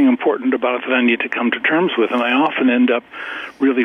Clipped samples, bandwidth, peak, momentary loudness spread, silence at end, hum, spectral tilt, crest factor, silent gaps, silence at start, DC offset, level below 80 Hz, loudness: under 0.1%; 3.8 kHz; -4 dBFS; 6 LU; 0 s; none; -6.5 dB/octave; 12 dB; none; 0 s; under 0.1%; -68 dBFS; -17 LUFS